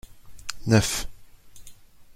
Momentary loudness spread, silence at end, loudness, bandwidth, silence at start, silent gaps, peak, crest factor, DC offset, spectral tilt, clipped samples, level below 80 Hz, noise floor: 17 LU; 0.05 s; -24 LUFS; 16 kHz; 0.1 s; none; -6 dBFS; 22 dB; under 0.1%; -4.5 dB/octave; under 0.1%; -44 dBFS; -47 dBFS